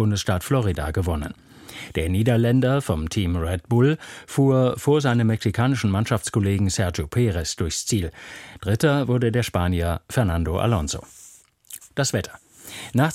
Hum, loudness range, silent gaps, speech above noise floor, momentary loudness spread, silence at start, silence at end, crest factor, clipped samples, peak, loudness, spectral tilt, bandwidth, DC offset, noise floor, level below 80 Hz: none; 3 LU; none; 28 dB; 13 LU; 0 s; 0 s; 16 dB; under 0.1%; -6 dBFS; -22 LUFS; -6 dB/octave; 16 kHz; under 0.1%; -50 dBFS; -38 dBFS